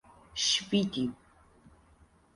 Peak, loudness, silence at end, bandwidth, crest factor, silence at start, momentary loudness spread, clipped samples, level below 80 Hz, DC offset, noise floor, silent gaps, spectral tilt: -14 dBFS; -30 LUFS; 1.2 s; 11.5 kHz; 20 dB; 0.35 s; 10 LU; under 0.1%; -62 dBFS; under 0.1%; -62 dBFS; none; -3 dB/octave